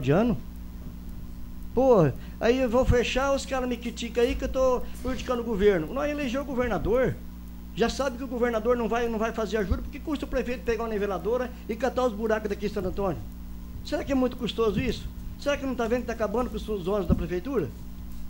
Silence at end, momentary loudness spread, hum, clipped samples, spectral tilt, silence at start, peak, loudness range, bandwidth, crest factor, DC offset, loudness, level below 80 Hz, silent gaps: 0 s; 16 LU; 60 Hz at -40 dBFS; under 0.1%; -6 dB/octave; 0 s; -8 dBFS; 4 LU; 16 kHz; 18 dB; under 0.1%; -27 LUFS; -38 dBFS; none